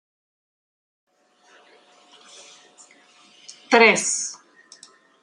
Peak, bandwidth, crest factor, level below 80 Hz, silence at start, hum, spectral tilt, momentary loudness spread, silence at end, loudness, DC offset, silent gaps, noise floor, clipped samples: -2 dBFS; 11.5 kHz; 24 dB; -74 dBFS; 3.5 s; none; -1.5 dB/octave; 29 LU; 0.9 s; -18 LUFS; under 0.1%; none; -58 dBFS; under 0.1%